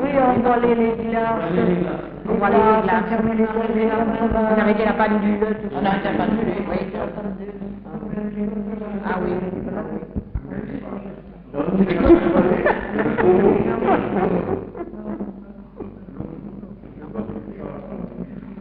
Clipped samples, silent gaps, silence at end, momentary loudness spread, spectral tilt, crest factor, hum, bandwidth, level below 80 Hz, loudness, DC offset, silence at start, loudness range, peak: under 0.1%; none; 0 s; 17 LU; -6.5 dB/octave; 18 dB; none; 4.8 kHz; -40 dBFS; -20 LUFS; under 0.1%; 0 s; 10 LU; -2 dBFS